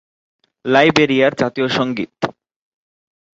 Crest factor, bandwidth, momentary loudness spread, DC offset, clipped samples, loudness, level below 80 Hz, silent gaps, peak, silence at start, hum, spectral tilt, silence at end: 18 dB; 8 kHz; 13 LU; under 0.1%; under 0.1%; -16 LUFS; -56 dBFS; none; 0 dBFS; 0.65 s; none; -5.5 dB/octave; 1.05 s